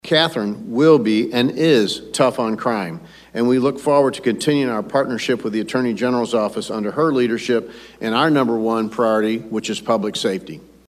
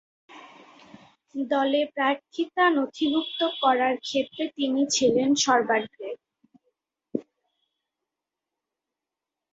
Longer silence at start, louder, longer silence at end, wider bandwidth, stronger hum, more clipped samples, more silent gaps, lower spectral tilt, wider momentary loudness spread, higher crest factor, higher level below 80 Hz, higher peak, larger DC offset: second, 0.05 s vs 0.3 s; first, -19 LUFS vs -24 LUFS; second, 0.25 s vs 2.3 s; first, 14.5 kHz vs 8 kHz; neither; neither; neither; first, -5 dB/octave vs -2.5 dB/octave; second, 8 LU vs 14 LU; about the same, 18 dB vs 20 dB; first, -58 dBFS vs -72 dBFS; first, -2 dBFS vs -8 dBFS; neither